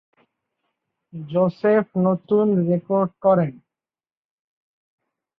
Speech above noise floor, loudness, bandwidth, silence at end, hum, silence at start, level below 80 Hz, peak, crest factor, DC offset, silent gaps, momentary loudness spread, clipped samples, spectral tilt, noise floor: over 70 dB; -20 LUFS; 5.2 kHz; 1.85 s; none; 1.15 s; -66 dBFS; -6 dBFS; 18 dB; under 0.1%; none; 8 LU; under 0.1%; -11.5 dB/octave; under -90 dBFS